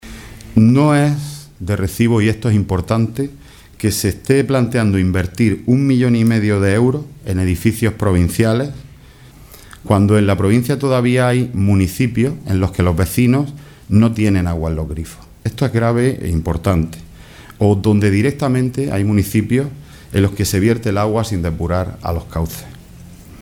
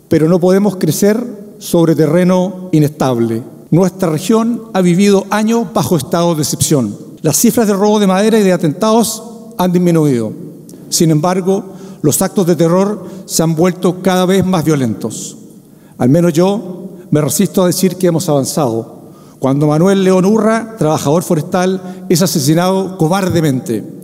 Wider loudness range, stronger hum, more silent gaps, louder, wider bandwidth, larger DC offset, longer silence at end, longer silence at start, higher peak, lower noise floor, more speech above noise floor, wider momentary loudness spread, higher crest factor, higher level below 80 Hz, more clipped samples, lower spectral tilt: about the same, 3 LU vs 2 LU; neither; neither; second, -16 LUFS vs -13 LUFS; about the same, 17.5 kHz vs 16.5 kHz; neither; about the same, 0.05 s vs 0 s; about the same, 0.05 s vs 0.1 s; about the same, 0 dBFS vs 0 dBFS; about the same, -41 dBFS vs -39 dBFS; about the same, 26 dB vs 27 dB; about the same, 11 LU vs 9 LU; about the same, 16 dB vs 12 dB; first, -34 dBFS vs -50 dBFS; neither; first, -7 dB/octave vs -5.5 dB/octave